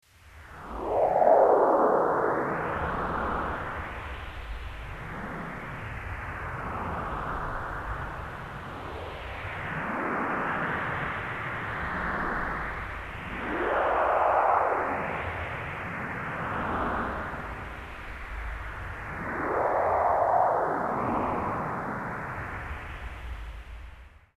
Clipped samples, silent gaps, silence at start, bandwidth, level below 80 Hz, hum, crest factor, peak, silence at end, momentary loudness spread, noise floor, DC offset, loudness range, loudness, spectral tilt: under 0.1%; none; 0.25 s; 14 kHz; -44 dBFS; none; 22 dB; -8 dBFS; 0.2 s; 16 LU; -50 dBFS; under 0.1%; 10 LU; -29 LUFS; -7 dB/octave